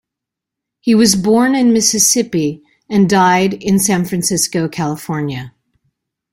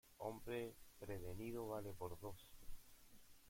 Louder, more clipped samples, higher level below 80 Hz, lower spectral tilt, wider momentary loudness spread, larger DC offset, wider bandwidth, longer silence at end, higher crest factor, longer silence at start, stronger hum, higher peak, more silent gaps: first, -13 LUFS vs -51 LUFS; neither; first, -52 dBFS vs -64 dBFS; second, -4 dB/octave vs -6 dB/octave; second, 10 LU vs 17 LU; neither; about the same, 16.5 kHz vs 16.5 kHz; first, 0.85 s vs 0 s; about the same, 14 dB vs 18 dB; first, 0.85 s vs 0.05 s; neither; first, 0 dBFS vs -34 dBFS; neither